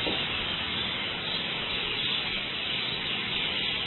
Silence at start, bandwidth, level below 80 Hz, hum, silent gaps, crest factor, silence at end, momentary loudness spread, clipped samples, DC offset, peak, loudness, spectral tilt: 0 s; 4.3 kHz; -52 dBFS; none; none; 14 dB; 0 s; 2 LU; under 0.1%; under 0.1%; -16 dBFS; -28 LUFS; -7.5 dB/octave